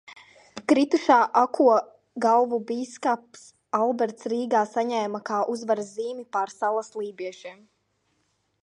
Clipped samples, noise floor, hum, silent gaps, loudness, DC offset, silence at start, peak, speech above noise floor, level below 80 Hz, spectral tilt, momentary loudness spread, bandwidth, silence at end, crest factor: under 0.1%; -72 dBFS; none; none; -24 LUFS; under 0.1%; 0.1 s; -6 dBFS; 48 dB; -78 dBFS; -4.5 dB/octave; 15 LU; 11 kHz; 1.1 s; 20 dB